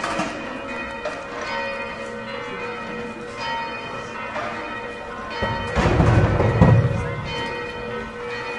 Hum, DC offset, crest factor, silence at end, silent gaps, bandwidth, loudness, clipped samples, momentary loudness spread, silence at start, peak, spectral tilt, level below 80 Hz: none; under 0.1%; 22 dB; 0 s; none; 11 kHz; -24 LUFS; under 0.1%; 13 LU; 0 s; 0 dBFS; -6.5 dB/octave; -36 dBFS